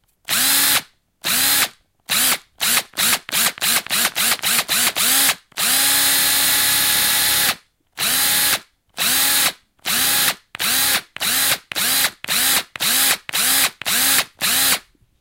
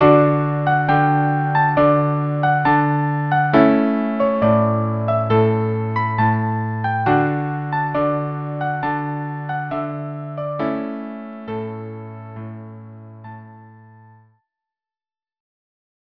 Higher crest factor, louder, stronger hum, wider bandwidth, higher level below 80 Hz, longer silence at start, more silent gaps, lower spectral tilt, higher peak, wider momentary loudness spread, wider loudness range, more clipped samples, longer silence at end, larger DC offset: about the same, 18 dB vs 20 dB; first, -16 LUFS vs -19 LUFS; neither; first, 17 kHz vs 5.4 kHz; about the same, -52 dBFS vs -52 dBFS; first, 0.3 s vs 0 s; neither; second, 1 dB/octave vs -10.5 dB/octave; about the same, 0 dBFS vs 0 dBFS; second, 6 LU vs 19 LU; second, 3 LU vs 17 LU; neither; second, 0.4 s vs 2.4 s; neither